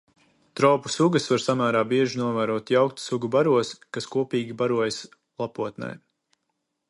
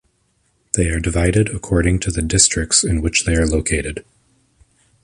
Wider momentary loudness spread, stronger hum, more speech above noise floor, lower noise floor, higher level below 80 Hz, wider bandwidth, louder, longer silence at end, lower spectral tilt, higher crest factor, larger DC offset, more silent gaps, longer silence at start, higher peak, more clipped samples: first, 13 LU vs 8 LU; neither; first, 54 dB vs 46 dB; first, -78 dBFS vs -63 dBFS; second, -68 dBFS vs -28 dBFS; about the same, 11.5 kHz vs 11.5 kHz; second, -24 LUFS vs -17 LUFS; about the same, 0.95 s vs 1 s; first, -5.5 dB/octave vs -4 dB/octave; about the same, 20 dB vs 18 dB; neither; neither; second, 0.55 s vs 0.75 s; second, -4 dBFS vs 0 dBFS; neither